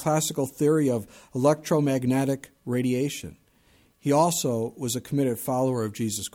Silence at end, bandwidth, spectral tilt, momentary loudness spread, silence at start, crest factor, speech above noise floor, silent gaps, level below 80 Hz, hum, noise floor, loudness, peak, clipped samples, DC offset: 0.05 s; 17.5 kHz; -5.5 dB/octave; 9 LU; 0 s; 16 dB; 36 dB; none; -62 dBFS; none; -61 dBFS; -25 LUFS; -8 dBFS; under 0.1%; under 0.1%